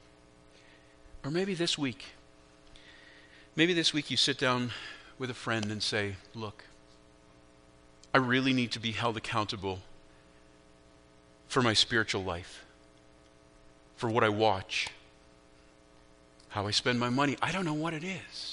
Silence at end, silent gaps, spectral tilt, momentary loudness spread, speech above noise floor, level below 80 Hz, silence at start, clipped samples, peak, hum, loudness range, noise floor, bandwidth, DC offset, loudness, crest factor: 0 s; none; -4 dB/octave; 16 LU; 28 dB; -62 dBFS; 1.05 s; under 0.1%; -6 dBFS; none; 5 LU; -59 dBFS; 10.5 kHz; under 0.1%; -30 LUFS; 28 dB